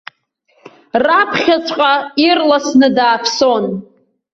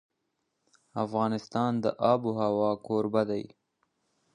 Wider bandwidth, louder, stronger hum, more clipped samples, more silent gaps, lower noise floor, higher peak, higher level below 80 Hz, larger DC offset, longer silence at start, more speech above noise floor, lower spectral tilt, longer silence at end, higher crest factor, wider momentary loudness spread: second, 7.8 kHz vs 10 kHz; first, -13 LUFS vs -29 LUFS; neither; neither; neither; second, -59 dBFS vs -80 dBFS; first, 0 dBFS vs -10 dBFS; first, -58 dBFS vs -70 dBFS; neither; second, 0.65 s vs 0.95 s; second, 46 dB vs 52 dB; second, -3.5 dB/octave vs -7.5 dB/octave; second, 0.5 s vs 0.9 s; second, 14 dB vs 20 dB; about the same, 7 LU vs 9 LU